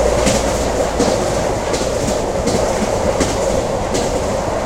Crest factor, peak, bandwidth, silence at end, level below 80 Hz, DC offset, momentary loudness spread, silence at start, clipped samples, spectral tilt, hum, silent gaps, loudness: 16 dB; 0 dBFS; 16 kHz; 0 s; -28 dBFS; under 0.1%; 3 LU; 0 s; under 0.1%; -4.5 dB/octave; none; none; -17 LUFS